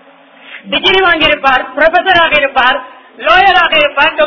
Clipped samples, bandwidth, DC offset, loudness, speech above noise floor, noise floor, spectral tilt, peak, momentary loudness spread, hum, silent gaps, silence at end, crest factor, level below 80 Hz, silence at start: 0.8%; 6 kHz; 0.9%; -8 LUFS; 29 dB; -39 dBFS; -4 dB/octave; 0 dBFS; 5 LU; none; none; 0 s; 10 dB; -40 dBFS; 0.45 s